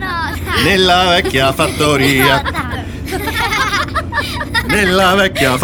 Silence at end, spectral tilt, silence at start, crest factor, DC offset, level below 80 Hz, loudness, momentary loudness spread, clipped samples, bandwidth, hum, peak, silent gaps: 0 s; -4 dB/octave; 0 s; 14 dB; under 0.1%; -30 dBFS; -13 LUFS; 9 LU; under 0.1%; over 20 kHz; none; 0 dBFS; none